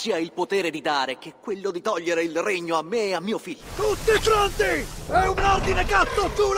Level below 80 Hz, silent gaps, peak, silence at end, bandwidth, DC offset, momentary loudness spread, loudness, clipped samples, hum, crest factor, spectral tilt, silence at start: -36 dBFS; none; -6 dBFS; 0 s; 16 kHz; under 0.1%; 9 LU; -23 LUFS; under 0.1%; none; 18 dB; -4 dB/octave; 0 s